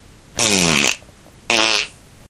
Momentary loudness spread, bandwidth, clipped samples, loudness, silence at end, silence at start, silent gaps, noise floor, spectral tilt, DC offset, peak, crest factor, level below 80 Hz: 15 LU; 16.5 kHz; under 0.1%; -16 LUFS; 0.4 s; 0.35 s; none; -44 dBFS; -1.5 dB/octave; under 0.1%; 0 dBFS; 20 dB; -46 dBFS